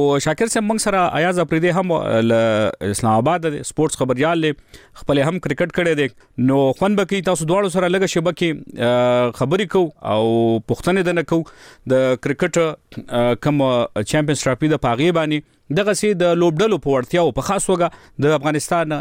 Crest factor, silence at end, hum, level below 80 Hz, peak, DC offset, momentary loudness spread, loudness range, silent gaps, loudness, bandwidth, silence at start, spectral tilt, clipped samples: 12 dB; 0 s; none; -46 dBFS; -6 dBFS; under 0.1%; 5 LU; 2 LU; none; -18 LUFS; 16 kHz; 0 s; -5.5 dB/octave; under 0.1%